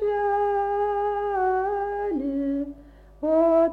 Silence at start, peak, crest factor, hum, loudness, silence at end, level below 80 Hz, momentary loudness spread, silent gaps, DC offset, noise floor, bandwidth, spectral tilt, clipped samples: 0 s; -10 dBFS; 14 dB; none; -24 LUFS; 0 s; -50 dBFS; 7 LU; none; under 0.1%; -48 dBFS; 4.8 kHz; -8 dB/octave; under 0.1%